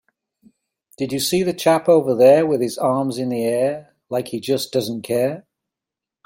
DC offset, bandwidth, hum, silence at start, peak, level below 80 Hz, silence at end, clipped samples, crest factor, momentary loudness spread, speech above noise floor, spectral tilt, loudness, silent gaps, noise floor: under 0.1%; 16.5 kHz; none; 1 s; -2 dBFS; -64 dBFS; 0.85 s; under 0.1%; 18 dB; 13 LU; 69 dB; -5 dB/octave; -19 LUFS; none; -87 dBFS